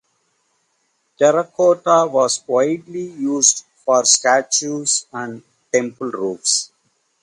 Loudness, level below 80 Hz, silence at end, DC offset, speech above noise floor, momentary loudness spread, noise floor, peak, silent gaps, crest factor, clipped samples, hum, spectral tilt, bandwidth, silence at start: -17 LUFS; -70 dBFS; 0.55 s; under 0.1%; 49 dB; 12 LU; -67 dBFS; 0 dBFS; none; 18 dB; under 0.1%; none; -2 dB/octave; 11.5 kHz; 1.2 s